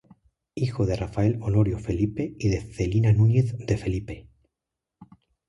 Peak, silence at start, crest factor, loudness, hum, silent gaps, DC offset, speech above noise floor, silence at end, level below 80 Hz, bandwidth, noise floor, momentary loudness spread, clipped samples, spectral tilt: -8 dBFS; 0.55 s; 16 dB; -25 LUFS; none; none; under 0.1%; 63 dB; 0.45 s; -42 dBFS; 10.5 kHz; -86 dBFS; 11 LU; under 0.1%; -8 dB/octave